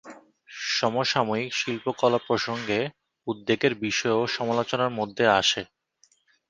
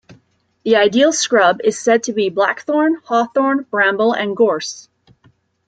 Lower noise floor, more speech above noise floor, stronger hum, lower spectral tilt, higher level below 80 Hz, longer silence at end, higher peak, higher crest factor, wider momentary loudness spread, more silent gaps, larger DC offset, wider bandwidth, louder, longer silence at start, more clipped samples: first, -65 dBFS vs -57 dBFS; about the same, 40 dB vs 42 dB; neither; about the same, -3.5 dB/octave vs -3 dB/octave; about the same, -64 dBFS vs -66 dBFS; about the same, 0.85 s vs 0.85 s; about the same, -4 dBFS vs -2 dBFS; first, 22 dB vs 14 dB; first, 11 LU vs 5 LU; neither; neither; about the same, 10 kHz vs 9.4 kHz; second, -25 LUFS vs -15 LUFS; second, 0.05 s vs 0.65 s; neither